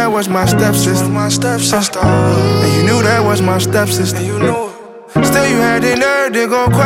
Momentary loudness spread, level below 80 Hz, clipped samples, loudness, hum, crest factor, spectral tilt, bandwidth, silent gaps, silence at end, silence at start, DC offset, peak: 4 LU; -36 dBFS; under 0.1%; -12 LUFS; none; 12 dB; -5 dB/octave; 17 kHz; none; 0 s; 0 s; under 0.1%; 0 dBFS